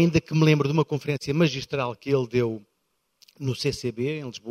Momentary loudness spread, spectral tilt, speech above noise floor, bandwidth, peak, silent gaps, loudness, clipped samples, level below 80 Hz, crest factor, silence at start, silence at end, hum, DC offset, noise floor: 10 LU; -6.5 dB/octave; 50 dB; 13 kHz; -6 dBFS; none; -25 LUFS; under 0.1%; -54 dBFS; 20 dB; 0 s; 0 s; none; under 0.1%; -74 dBFS